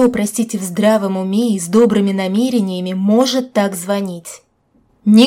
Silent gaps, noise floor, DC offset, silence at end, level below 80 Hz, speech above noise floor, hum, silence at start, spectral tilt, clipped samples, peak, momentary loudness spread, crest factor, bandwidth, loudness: none; -57 dBFS; under 0.1%; 0 s; -56 dBFS; 42 dB; none; 0 s; -5.5 dB/octave; under 0.1%; 0 dBFS; 8 LU; 14 dB; 16 kHz; -16 LUFS